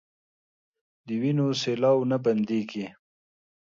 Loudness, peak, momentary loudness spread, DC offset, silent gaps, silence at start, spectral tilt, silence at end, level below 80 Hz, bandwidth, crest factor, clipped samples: -26 LUFS; -10 dBFS; 12 LU; under 0.1%; none; 1.05 s; -6.5 dB/octave; 0.7 s; -74 dBFS; 7.6 kHz; 16 dB; under 0.1%